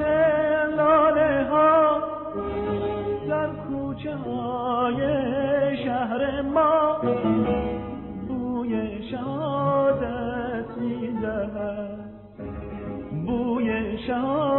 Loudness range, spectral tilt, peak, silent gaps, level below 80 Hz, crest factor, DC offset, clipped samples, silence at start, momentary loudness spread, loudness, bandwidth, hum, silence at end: 7 LU; -5.5 dB/octave; -10 dBFS; none; -46 dBFS; 14 dB; under 0.1%; under 0.1%; 0 s; 13 LU; -24 LUFS; 4.2 kHz; none; 0 s